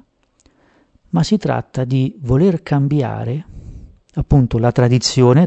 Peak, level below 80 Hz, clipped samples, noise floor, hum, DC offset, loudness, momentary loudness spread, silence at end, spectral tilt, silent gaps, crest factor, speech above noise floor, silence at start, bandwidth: 0 dBFS; -34 dBFS; under 0.1%; -57 dBFS; none; under 0.1%; -16 LUFS; 12 LU; 0 s; -7 dB/octave; none; 16 dB; 43 dB; 1.15 s; 8.4 kHz